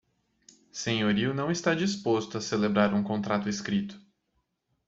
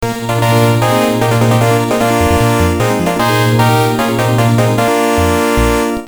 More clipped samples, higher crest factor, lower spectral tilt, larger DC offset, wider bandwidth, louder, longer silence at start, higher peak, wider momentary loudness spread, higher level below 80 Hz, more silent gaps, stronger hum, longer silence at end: neither; first, 20 dB vs 12 dB; about the same, -5 dB/octave vs -5.5 dB/octave; neither; second, 7.8 kHz vs over 20 kHz; second, -28 LUFS vs -12 LUFS; first, 0.75 s vs 0 s; second, -8 dBFS vs 0 dBFS; first, 6 LU vs 3 LU; second, -64 dBFS vs -28 dBFS; neither; neither; first, 0.9 s vs 0 s